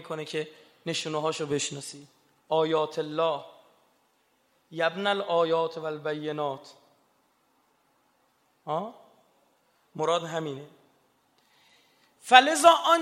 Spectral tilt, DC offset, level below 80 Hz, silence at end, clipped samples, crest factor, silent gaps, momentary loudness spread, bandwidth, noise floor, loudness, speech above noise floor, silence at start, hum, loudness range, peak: -3 dB/octave; under 0.1%; -80 dBFS; 0 s; under 0.1%; 28 dB; none; 23 LU; 15 kHz; -69 dBFS; -26 LUFS; 43 dB; 0 s; none; 11 LU; 0 dBFS